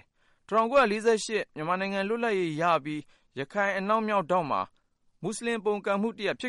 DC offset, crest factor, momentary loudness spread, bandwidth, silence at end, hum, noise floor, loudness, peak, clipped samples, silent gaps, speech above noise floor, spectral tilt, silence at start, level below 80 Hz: under 0.1%; 16 dB; 13 LU; 11.5 kHz; 0 s; none; -59 dBFS; -28 LUFS; -12 dBFS; under 0.1%; none; 32 dB; -4.5 dB/octave; 0.5 s; -66 dBFS